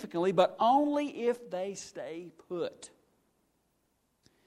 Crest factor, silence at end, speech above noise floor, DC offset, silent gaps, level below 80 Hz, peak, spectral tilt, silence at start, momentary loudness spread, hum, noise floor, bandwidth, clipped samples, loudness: 22 dB; 1.6 s; 45 dB; under 0.1%; none; -78 dBFS; -10 dBFS; -5 dB/octave; 0 s; 16 LU; none; -76 dBFS; 13.5 kHz; under 0.1%; -31 LUFS